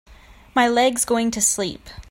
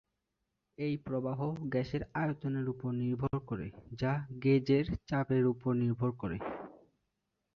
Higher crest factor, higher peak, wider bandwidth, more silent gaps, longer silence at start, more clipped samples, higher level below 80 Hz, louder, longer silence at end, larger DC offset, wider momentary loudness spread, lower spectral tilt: about the same, 16 dB vs 16 dB; first, -4 dBFS vs -18 dBFS; first, 16.5 kHz vs 6.6 kHz; neither; second, 0.1 s vs 0.8 s; neither; first, -48 dBFS vs -58 dBFS; first, -19 LUFS vs -34 LUFS; second, 0.1 s vs 0.8 s; neither; about the same, 9 LU vs 10 LU; second, -2 dB/octave vs -9 dB/octave